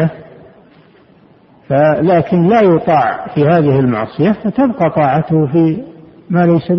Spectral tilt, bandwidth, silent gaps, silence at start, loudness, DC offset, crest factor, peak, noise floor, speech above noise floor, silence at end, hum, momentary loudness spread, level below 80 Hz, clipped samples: -10.5 dB/octave; 5.8 kHz; none; 0 s; -12 LUFS; under 0.1%; 12 dB; 0 dBFS; -46 dBFS; 34 dB; 0 s; none; 6 LU; -48 dBFS; under 0.1%